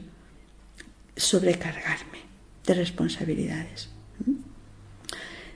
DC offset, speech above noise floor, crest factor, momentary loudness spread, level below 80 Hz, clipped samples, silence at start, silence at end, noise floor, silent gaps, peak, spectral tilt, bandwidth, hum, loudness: under 0.1%; 25 dB; 22 dB; 24 LU; -52 dBFS; under 0.1%; 0 s; 0 s; -52 dBFS; none; -8 dBFS; -4 dB/octave; 11 kHz; none; -28 LUFS